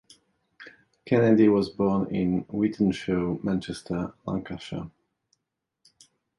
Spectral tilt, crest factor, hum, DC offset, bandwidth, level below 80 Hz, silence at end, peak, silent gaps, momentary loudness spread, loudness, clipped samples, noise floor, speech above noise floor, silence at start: -7.5 dB/octave; 18 dB; none; under 0.1%; 11.5 kHz; -54 dBFS; 1.5 s; -8 dBFS; none; 15 LU; -26 LUFS; under 0.1%; -83 dBFS; 58 dB; 0.6 s